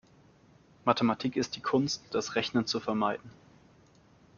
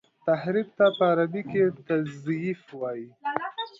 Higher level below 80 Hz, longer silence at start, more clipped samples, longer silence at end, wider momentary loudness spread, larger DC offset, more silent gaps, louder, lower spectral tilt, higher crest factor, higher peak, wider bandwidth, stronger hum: about the same, -68 dBFS vs -72 dBFS; first, 0.85 s vs 0.25 s; neither; first, 1.05 s vs 0.1 s; second, 5 LU vs 12 LU; neither; neither; second, -30 LUFS vs -27 LUFS; second, -4.5 dB/octave vs -8 dB/octave; about the same, 24 dB vs 20 dB; about the same, -8 dBFS vs -8 dBFS; about the same, 7.2 kHz vs 7.6 kHz; neither